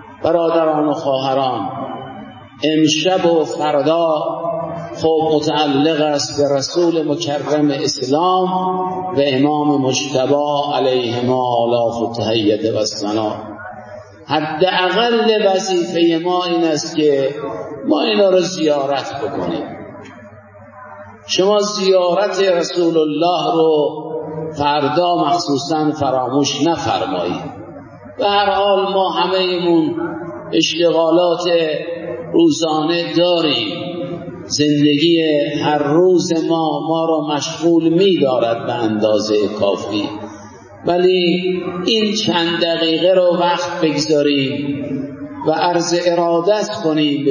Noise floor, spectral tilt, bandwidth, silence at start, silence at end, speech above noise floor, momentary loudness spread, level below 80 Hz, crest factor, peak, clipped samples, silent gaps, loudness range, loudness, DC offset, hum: -39 dBFS; -4.5 dB/octave; 7.4 kHz; 0 s; 0 s; 24 dB; 11 LU; -56 dBFS; 14 dB; -2 dBFS; under 0.1%; none; 3 LU; -16 LUFS; under 0.1%; none